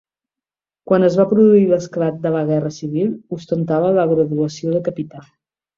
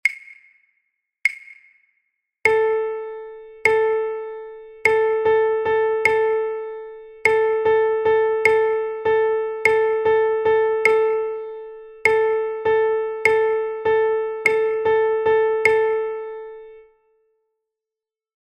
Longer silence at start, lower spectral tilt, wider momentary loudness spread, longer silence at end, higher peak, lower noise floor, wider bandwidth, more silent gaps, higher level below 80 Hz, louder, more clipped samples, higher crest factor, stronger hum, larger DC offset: first, 0.85 s vs 0.05 s; first, -8 dB/octave vs -3.5 dB/octave; second, 12 LU vs 16 LU; second, 0.55 s vs 1.7 s; about the same, -2 dBFS vs -2 dBFS; about the same, -89 dBFS vs -89 dBFS; second, 7.4 kHz vs 9.2 kHz; neither; about the same, -60 dBFS vs -60 dBFS; about the same, -17 LUFS vs -19 LUFS; neither; about the same, 16 dB vs 18 dB; neither; neither